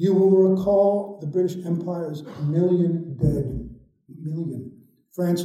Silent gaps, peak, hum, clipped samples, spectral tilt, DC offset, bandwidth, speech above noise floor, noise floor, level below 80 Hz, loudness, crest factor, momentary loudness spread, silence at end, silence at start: none; -8 dBFS; none; under 0.1%; -9 dB/octave; under 0.1%; 14.5 kHz; 24 dB; -45 dBFS; -46 dBFS; -23 LUFS; 14 dB; 18 LU; 0 s; 0 s